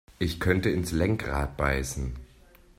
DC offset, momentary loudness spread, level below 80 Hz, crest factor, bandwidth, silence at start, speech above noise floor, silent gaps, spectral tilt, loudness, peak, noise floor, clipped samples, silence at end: under 0.1%; 9 LU; -38 dBFS; 20 dB; 16 kHz; 0.2 s; 28 dB; none; -5.5 dB/octave; -28 LUFS; -8 dBFS; -55 dBFS; under 0.1%; 0.55 s